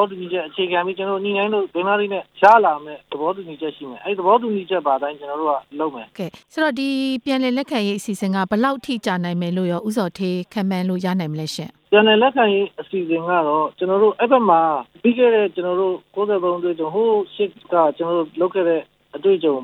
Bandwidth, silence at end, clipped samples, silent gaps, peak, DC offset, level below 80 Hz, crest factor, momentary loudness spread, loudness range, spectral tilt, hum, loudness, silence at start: 15 kHz; 0 s; under 0.1%; none; 0 dBFS; under 0.1%; -68 dBFS; 18 dB; 11 LU; 5 LU; -6 dB/octave; none; -19 LUFS; 0 s